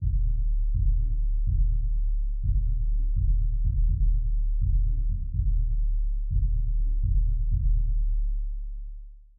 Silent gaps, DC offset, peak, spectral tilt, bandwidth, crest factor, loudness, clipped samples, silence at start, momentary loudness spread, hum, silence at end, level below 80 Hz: none; under 0.1%; -14 dBFS; -20 dB/octave; 0.4 kHz; 8 dB; -29 LUFS; under 0.1%; 0 s; 4 LU; none; 0.2 s; -24 dBFS